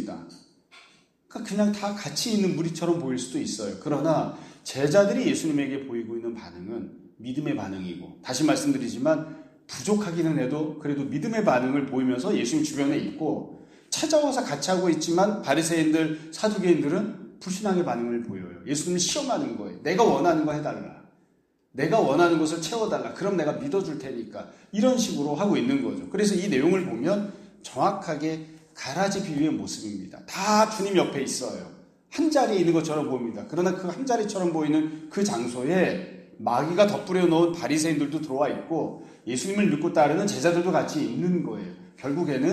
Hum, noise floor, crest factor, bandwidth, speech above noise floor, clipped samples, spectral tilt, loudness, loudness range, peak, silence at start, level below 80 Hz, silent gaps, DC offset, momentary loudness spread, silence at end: none; -67 dBFS; 20 dB; 14.5 kHz; 42 dB; under 0.1%; -5 dB/octave; -26 LUFS; 3 LU; -6 dBFS; 0 s; -66 dBFS; none; under 0.1%; 14 LU; 0 s